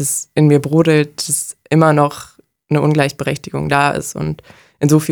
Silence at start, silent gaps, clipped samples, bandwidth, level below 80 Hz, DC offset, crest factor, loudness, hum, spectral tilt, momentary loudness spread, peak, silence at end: 0 s; none; under 0.1%; 19.5 kHz; -48 dBFS; under 0.1%; 14 dB; -15 LUFS; none; -5.5 dB/octave; 10 LU; 0 dBFS; 0 s